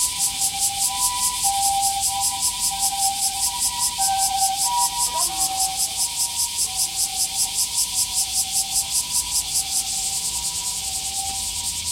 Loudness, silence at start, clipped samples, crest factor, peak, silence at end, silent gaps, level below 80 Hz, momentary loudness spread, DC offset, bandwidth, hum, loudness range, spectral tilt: -20 LUFS; 0 s; under 0.1%; 18 dB; -6 dBFS; 0 s; none; -48 dBFS; 4 LU; under 0.1%; 16.5 kHz; none; 1 LU; 1.5 dB/octave